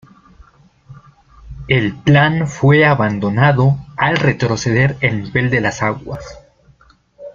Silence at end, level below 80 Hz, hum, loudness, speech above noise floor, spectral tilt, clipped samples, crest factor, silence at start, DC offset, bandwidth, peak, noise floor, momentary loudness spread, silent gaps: 0.05 s; -42 dBFS; none; -15 LUFS; 36 dB; -6.5 dB/octave; under 0.1%; 16 dB; 0.9 s; under 0.1%; 7.4 kHz; -2 dBFS; -50 dBFS; 9 LU; none